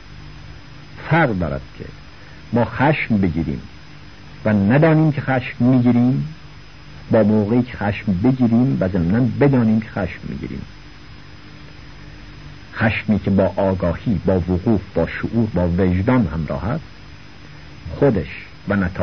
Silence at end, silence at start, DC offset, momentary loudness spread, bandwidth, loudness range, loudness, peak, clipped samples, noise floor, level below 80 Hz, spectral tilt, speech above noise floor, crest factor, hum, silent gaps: 0 s; 0.1 s; 0.8%; 23 LU; 6.4 kHz; 5 LU; -18 LUFS; -2 dBFS; under 0.1%; -40 dBFS; -40 dBFS; -9.5 dB/octave; 23 dB; 16 dB; none; none